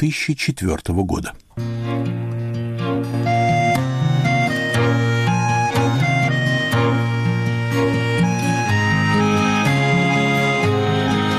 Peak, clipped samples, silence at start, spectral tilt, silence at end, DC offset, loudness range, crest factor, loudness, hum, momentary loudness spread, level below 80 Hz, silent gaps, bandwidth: -8 dBFS; under 0.1%; 0 s; -6 dB/octave; 0 s; under 0.1%; 4 LU; 10 dB; -18 LUFS; none; 7 LU; -42 dBFS; none; 14 kHz